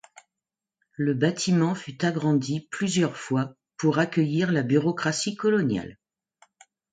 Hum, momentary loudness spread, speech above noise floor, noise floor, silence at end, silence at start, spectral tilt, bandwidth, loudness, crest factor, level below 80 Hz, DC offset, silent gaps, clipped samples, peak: none; 6 LU; 65 dB; -89 dBFS; 1 s; 1 s; -5.5 dB/octave; 9.4 kHz; -25 LUFS; 18 dB; -64 dBFS; under 0.1%; none; under 0.1%; -8 dBFS